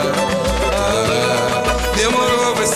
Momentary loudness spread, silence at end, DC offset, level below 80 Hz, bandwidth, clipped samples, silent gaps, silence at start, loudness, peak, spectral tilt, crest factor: 3 LU; 0 s; 0.3%; -28 dBFS; 14.5 kHz; under 0.1%; none; 0 s; -16 LUFS; -2 dBFS; -3.5 dB/octave; 14 dB